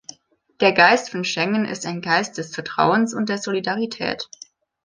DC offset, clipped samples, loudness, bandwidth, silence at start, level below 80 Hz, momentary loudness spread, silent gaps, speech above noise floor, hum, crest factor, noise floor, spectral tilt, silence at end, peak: under 0.1%; under 0.1%; -20 LUFS; 10 kHz; 0.6 s; -64 dBFS; 13 LU; none; 36 dB; none; 20 dB; -56 dBFS; -4 dB/octave; 0.6 s; -2 dBFS